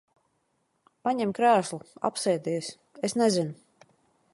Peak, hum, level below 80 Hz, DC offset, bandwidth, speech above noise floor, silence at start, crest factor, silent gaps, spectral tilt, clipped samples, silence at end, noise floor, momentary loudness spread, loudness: -10 dBFS; none; -74 dBFS; under 0.1%; 11.5 kHz; 48 dB; 1.05 s; 18 dB; none; -4.5 dB/octave; under 0.1%; 0.8 s; -74 dBFS; 11 LU; -27 LUFS